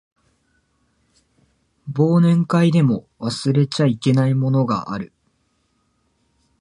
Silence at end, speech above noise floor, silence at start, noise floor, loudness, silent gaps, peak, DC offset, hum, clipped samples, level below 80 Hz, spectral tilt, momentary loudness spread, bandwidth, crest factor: 1.55 s; 49 dB; 1.85 s; -66 dBFS; -18 LUFS; none; -4 dBFS; under 0.1%; none; under 0.1%; -58 dBFS; -7.5 dB/octave; 14 LU; 11 kHz; 16 dB